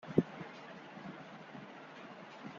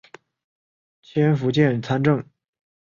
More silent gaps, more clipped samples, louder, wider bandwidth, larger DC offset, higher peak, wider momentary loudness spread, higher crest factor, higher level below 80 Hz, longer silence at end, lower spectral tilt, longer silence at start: neither; neither; second, -45 LUFS vs -21 LUFS; about the same, 7.4 kHz vs 7.2 kHz; neither; second, -14 dBFS vs -6 dBFS; first, 15 LU vs 5 LU; first, 28 dB vs 18 dB; second, -74 dBFS vs -60 dBFS; second, 0 s vs 0.7 s; second, -6.5 dB/octave vs -8 dB/octave; second, 0 s vs 1.15 s